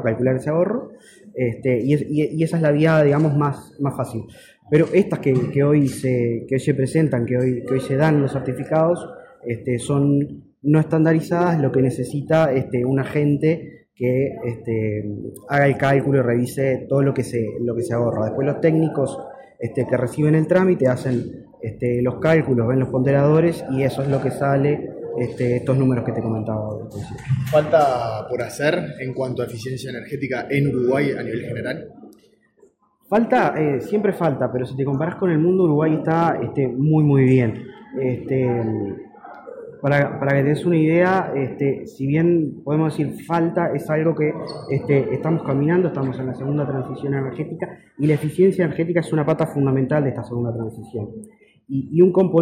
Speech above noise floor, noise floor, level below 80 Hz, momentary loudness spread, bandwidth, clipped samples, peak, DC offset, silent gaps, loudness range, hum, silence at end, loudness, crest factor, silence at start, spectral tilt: 37 dB; -57 dBFS; -56 dBFS; 11 LU; 14.5 kHz; under 0.1%; -4 dBFS; under 0.1%; none; 3 LU; none; 0 s; -20 LUFS; 16 dB; 0 s; -8 dB/octave